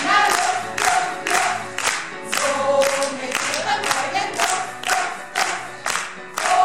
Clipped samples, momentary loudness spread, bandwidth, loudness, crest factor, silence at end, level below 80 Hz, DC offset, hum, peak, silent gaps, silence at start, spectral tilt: under 0.1%; 6 LU; 16 kHz; -21 LUFS; 18 dB; 0 s; -60 dBFS; 0.6%; none; -4 dBFS; none; 0 s; -0.5 dB/octave